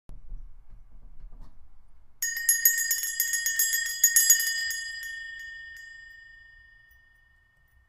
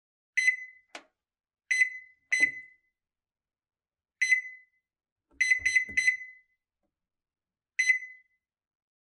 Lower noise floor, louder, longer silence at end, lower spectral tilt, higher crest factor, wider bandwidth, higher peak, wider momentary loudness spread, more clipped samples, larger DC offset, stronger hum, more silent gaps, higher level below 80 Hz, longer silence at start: second, -63 dBFS vs under -90 dBFS; first, -23 LUFS vs -27 LUFS; first, 1.45 s vs 0.95 s; second, 4 dB/octave vs 1.5 dB/octave; first, 28 dB vs 20 dB; first, 16 kHz vs 13 kHz; first, -2 dBFS vs -12 dBFS; about the same, 22 LU vs 21 LU; neither; neither; neither; second, none vs 5.12-5.16 s; first, -50 dBFS vs -70 dBFS; second, 0.1 s vs 0.35 s